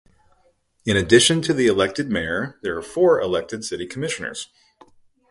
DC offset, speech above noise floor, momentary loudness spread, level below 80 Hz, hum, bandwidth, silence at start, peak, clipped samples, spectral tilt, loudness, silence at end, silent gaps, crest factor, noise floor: under 0.1%; 42 dB; 15 LU; -48 dBFS; none; 11.5 kHz; 0.85 s; -2 dBFS; under 0.1%; -4 dB/octave; -20 LUFS; 0.85 s; none; 20 dB; -62 dBFS